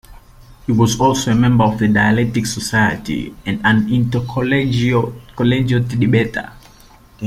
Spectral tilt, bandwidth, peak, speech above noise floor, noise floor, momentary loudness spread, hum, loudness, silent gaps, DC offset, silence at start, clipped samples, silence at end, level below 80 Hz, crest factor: -6 dB/octave; 15 kHz; 0 dBFS; 29 dB; -45 dBFS; 10 LU; none; -16 LUFS; none; under 0.1%; 0.1 s; under 0.1%; 0 s; -40 dBFS; 16 dB